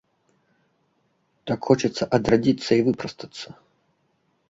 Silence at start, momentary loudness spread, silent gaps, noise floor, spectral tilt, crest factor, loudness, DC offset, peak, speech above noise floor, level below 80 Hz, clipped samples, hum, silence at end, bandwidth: 1.45 s; 18 LU; none; -69 dBFS; -6 dB/octave; 22 dB; -22 LUFS; under 0.1%; -4 dBFS; 47 dB; -54 dBFS; under 0.1%; none; 1 s; 7.8 kHz